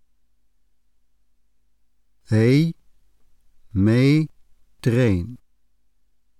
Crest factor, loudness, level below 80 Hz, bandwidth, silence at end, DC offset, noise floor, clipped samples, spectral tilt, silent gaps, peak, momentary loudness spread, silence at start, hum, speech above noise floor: 16 dB; -20 LUFS; -52 dBFS; 13 kHz; 1.05 s; 0.2%; -68 dBFS; under 0.1%; -8 dB/octave; none; -8 dBFS; 12 LU; 2.3 s; none; 50 dB